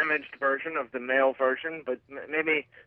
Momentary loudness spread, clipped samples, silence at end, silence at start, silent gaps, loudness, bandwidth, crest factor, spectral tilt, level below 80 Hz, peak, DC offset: 10 LU; under 0.1%; 0.05 s; 0 s; none; -28 LUFS; 4.5 kHz; 18 dB; -6.5 dB/octave; -76 dBFS; -12 dBFS; under 0.1%